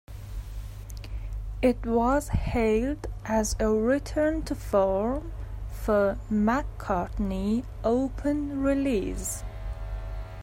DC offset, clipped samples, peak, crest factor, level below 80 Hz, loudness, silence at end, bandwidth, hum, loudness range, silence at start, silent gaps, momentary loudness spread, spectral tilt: under 0.1%; under 0.1%; -10 dBFS; 16 dB; -36 dBFS; -27 LUFS; 0 s; 16 kHz; none; 2 LU; 0.1 s; none; 14 LU; -6 dB/octave